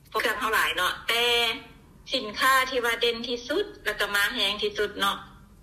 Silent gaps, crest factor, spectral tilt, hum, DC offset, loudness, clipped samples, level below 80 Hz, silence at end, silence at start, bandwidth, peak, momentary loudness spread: none; 18 dB; -1.5 dB/octave; none; under 0.1%; -25 LUFS; under 0.1%; -54 dBFS; 0.25 s; 0.1 s; 15.5 kHz; -10 dBFS; 8 LU